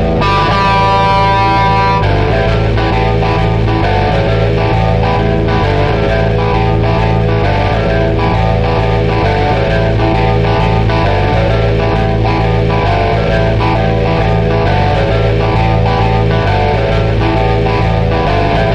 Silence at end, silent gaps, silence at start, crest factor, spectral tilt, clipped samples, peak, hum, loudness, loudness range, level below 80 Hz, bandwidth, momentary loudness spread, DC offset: 0 s; none; 0 s; 10 dB; -7.5 dB/octave; under 0.1%; -2 dBFS; none; -12 LUFS; 1 LU; -18 dBFS; 7.4 kHz; 2 LU; 0.5%